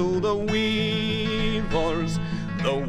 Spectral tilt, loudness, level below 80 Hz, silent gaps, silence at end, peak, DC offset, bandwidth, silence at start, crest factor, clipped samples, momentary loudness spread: -6 dB/octave; -25 LUFS; -36 dBFS; none; 0 s; -10 dBFS; under 0.1%; 11.5 kHz; 0 s; 14 dB; under 0.1%; 4 LU